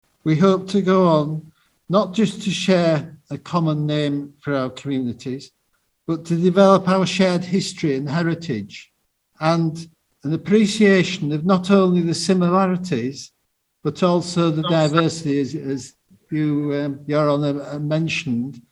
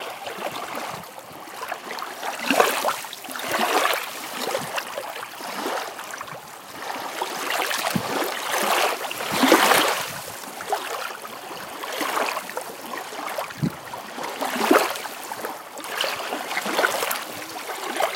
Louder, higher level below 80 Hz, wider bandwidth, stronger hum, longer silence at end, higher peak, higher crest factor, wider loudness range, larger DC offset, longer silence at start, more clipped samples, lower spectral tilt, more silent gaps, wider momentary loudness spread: first, -20 LUFS vs -25 LUFS; first, -60 dBFS vs -68 dBFS; second, 11.5 kHz vs 17 kHz; neither; about the same, 0.1 s vs 0 s; about the same, 0 dBFS vs 0 dBFS; second, 20 dB vs 26 dB; second, 5 LU vs 8 LU; neither; first, 0.25 s vs 0 s; neither; first, -6.5 dB/octave vs -2.5 dB/octave; neither; about the same, 13 LU vs 14 LU